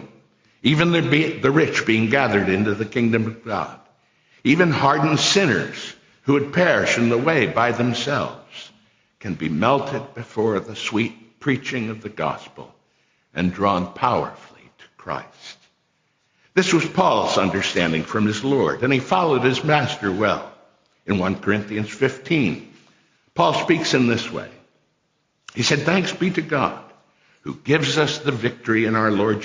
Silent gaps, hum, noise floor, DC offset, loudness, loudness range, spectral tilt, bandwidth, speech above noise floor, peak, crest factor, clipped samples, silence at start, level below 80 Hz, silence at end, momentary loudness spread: none; none; -69 dBFS; under 0.1%; -20 LUFS; 6 LU; -5 dB/octave; 7.6 kHz; 49 dB; -4 dBFS; 18 dB; under 0.1%; 0 s; -52 dBFS; 0 s; 14 LU